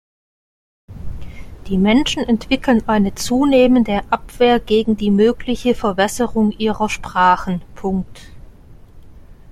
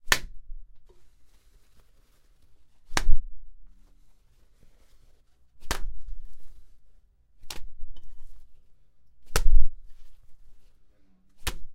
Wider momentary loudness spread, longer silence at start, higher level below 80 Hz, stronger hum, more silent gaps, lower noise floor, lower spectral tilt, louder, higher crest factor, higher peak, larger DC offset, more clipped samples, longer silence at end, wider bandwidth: second, 18 LU vs 28 LU; first, 0.9 s vs 0.05 s; second, -36 dBFS vs -30 dBFS; neither; neither; second, -40 dBFS vs -57 dBFS; first, -5.5 dB/octave vs -2.5 dB/octave; first, -17 LUFS vs -32 LUFS; about the same, 16 dB vs 20 dB; about the same, -2 dBFS vs -2 dBFS; neither; neither; about the same, 0 s vs 0 s; about the same, 15 kHz vs 14 kHz